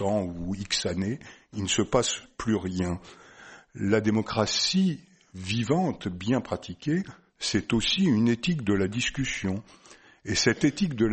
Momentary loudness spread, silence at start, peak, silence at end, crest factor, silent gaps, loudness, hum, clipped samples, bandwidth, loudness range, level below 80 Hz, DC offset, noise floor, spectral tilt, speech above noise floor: 11 LU; 0 s; -8 dBFS; 0 s; 20 dB; none; -27 LUFS; none; under 0.1%; 8.8 kHz; 3 LU; -50 dBFS; under 0.1%; -50 dBFS; -4.5 dB/octave; 23 dB